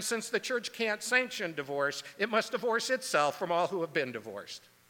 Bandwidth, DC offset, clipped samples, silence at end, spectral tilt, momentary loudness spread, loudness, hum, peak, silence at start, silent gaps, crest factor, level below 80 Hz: 19 kHz; under 0.1%; under 0.1%; 0.3 s; -2.5 dB/octave; 8 LU; -31 LUFS; none; -12 dBFS; 0 s; none; 20 dB; -84 dBFS